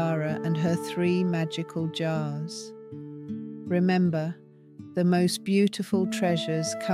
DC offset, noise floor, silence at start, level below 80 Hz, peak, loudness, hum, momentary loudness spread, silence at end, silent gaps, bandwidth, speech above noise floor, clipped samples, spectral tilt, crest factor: under 0.1%; -47 dBFS; 0 s; -72 dBFS; -12 dBFS; -27 LUFS; none; 15 LU; 0 s; none; 14.5 kHz; 21 dB; under 0.1%; -6 dB/octave; 16 dB